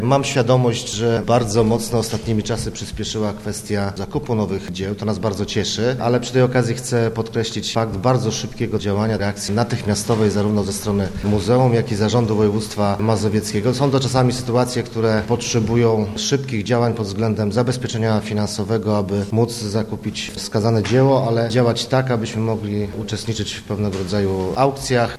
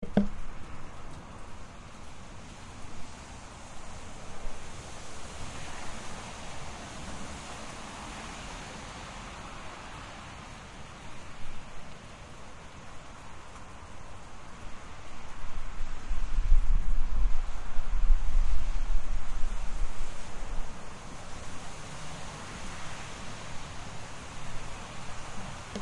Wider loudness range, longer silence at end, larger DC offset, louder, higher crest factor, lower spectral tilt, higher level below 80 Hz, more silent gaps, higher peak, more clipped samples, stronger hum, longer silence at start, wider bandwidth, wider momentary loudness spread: second, 3 LU vs 12 LU; about the same, 0 s vs 0 s; first, 0.1% vs under 0.1%; first, -19 LUFS vs -41 LUFS; about the same, 18 dB vs 18 dB; about the same, -5.5 dB/octave vs -4.5 dB/octave; second, -42 dBFS vs -34 dBFS; neither; first, -2 dBFS vs -8 dBFS; neither; neither; about the same, 0 s vs 0 s; first, 14 kHz vs 10.5 kHz; second, 7 LU vs 13 LU